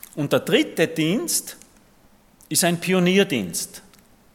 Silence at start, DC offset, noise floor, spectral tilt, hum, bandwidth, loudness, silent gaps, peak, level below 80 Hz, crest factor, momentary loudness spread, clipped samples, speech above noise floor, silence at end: 0.15 s; under 0.1%; -55 dBFS; -4 dB/octave; none; 17.5 kHz; -21 LUFS; none; -4 dBFS; -62 dBFS; 20 dB; 9 LU; under 0.1%; 34 dB; 0.55 s